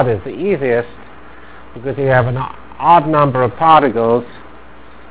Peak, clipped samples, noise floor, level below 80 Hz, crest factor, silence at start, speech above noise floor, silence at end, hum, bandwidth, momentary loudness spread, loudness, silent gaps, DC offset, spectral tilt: 0 dBFS; 0.2%; -40 dBFS; -44 dBFS; 16 dB; 0 s; 26 dB; 0.65 s; none; 4 kHz; 15 LU; -14 LUFS; none; 2%; -10.5 dB/octave